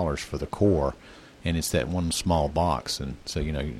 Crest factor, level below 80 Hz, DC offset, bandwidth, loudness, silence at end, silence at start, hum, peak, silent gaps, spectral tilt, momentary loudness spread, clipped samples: 18 dB; -38 dBFS; under 0.1%; 16.5 kHz; -27 LUFS; 0 s; 0 s; none; -10 dBFS; none; -5 dB/octave; 9 LU; under 0.1%